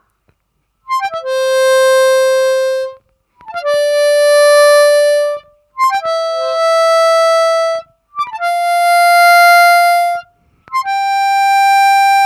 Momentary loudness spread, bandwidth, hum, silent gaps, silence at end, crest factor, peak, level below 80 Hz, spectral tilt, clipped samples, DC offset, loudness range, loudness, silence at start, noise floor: 13 LU; 17 kHz; none; none; 0 s; 10 dB; 0 dBFS; -64 dBFS; 2 dB/octave; under 0.1%; under 0.1%; 4 LU; -11 LUFS; 0.9 s; -65 dBFS